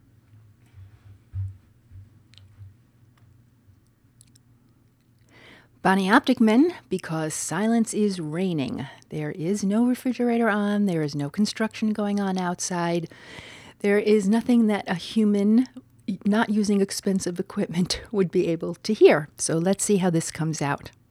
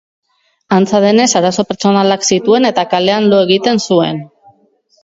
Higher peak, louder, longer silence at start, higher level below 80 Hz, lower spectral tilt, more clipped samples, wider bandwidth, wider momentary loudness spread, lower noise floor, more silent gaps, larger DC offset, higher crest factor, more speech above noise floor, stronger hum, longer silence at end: second, -4 dBFS vs 0 dBFS; second, -23 LUFS vs -11 LUFS; about the same, 0.75 s vs 0.7 s; about the same, -58 dBFS vs -56 dBFS; about the same, -5.5 dB/octave vs -4.5 dB/octave; neither; first, 14 kHz vs 7.8 kHz; first, 13 LU vs 5 LU; first, -60 dBFS vs -54 dBFS; neither; neither; first, 20 dB vs 12 dB; second, 37 dB vs 43 dB; neither; second, 0.2 s vs 0.8 s